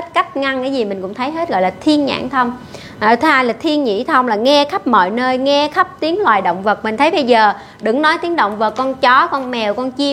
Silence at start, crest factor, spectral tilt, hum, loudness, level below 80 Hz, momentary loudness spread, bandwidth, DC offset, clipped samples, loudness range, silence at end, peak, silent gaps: 0 s; 14 dB; -4.5 dB/octave; none; -15 LUFS; -54 dBFS; 7 LU; 13.5 kHz; under 0.1%; under 0.1%; 2 LU; 0 s; 0 dBFS; none